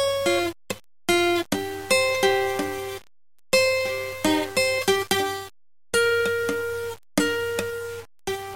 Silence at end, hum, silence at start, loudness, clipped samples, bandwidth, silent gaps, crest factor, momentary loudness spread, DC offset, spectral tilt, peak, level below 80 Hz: 0 s; none; 0 s; -23 LUFS; under 0.1%; 17 kHz; none; 20 dB; 13 LU; 0.4%; -3 dB/octave; -4 dBFS; -56 dBFS